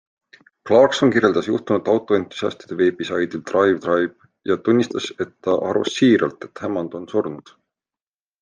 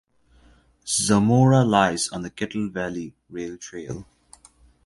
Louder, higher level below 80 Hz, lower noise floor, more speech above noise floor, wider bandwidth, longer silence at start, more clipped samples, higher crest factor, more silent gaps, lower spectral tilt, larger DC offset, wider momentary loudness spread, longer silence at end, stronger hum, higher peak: about the same, -20 LUFS vs -21 LUFS; second, -64 dBFS vs -52 dBFS; first, under -90 dBFS vs -56 dBFS; first, over 71 dB vs 34 dB; second, 9.4 kHz vs 11.5 kHz; second, 0.65 s vs 0.85 s; neither; about the same, 20 dB vs 22 dB; neither; about the same, -5.5 dB/octave vs -5 dB/octave; neither; second, 11 LU vs 19 LU; first, 1 s vs 0.8 s; neither; about the same, 0 dBFS vs -2 dBFS